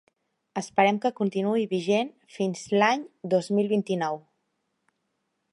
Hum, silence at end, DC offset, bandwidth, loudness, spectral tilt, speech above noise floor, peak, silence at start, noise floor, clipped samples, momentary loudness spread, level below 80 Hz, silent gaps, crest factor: none; 1.35 s; under 0.1%; 11.5 kHz; -26 LUFS; -5.5 dB/octave; 52 dB; -6 dBFS; 0.55 s; -77 dBFS; under 0.1%; 9 LU; -74 dBFS; none; 20 dB